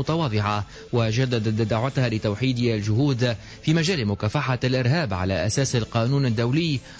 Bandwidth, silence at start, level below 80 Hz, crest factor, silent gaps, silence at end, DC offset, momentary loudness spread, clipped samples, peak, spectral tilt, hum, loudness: 8 kHz; 0 s; -44 dBFS; 12 dB; none; 0 s; under 0.1%; 3 LU; under 0.1%; -10 dBFS; -6 dB/octave; none; -23 LUFS